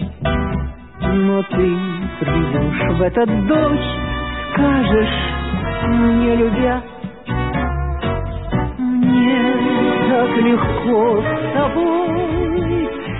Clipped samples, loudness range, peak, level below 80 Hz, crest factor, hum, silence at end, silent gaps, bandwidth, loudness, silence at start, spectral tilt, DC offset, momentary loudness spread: under 0.1%; 3 LU; -4 dBFS; -28 dBFS; 12 dB; none; 0 s; none; 4.1 kHz; -17 LUFS; 0 s; -12.5 dB/octave; 0.4%; 8 LU